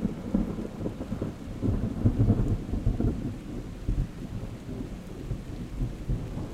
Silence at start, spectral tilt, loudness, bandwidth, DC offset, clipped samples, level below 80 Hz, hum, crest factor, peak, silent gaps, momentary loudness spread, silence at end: 0 s; -8.5 dB/octave; -32 LUFS; 13 kHz; under 0.1%; under 0.1%; -36 dBFS; none; 20 dB; -10 dBFS; none; 12 LU; 0 s